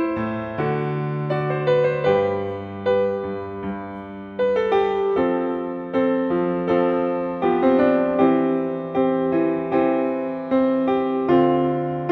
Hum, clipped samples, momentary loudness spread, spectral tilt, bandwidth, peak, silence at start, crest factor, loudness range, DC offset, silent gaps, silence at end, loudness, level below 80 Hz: none; under 0.1%; 9 LU; -9 dB/octave; 5 kHz; -6 dBFS; 0 s; 16 dB; 3 LU; under 0.1%; none; 0 s; -21 LUFS; -54 dBFS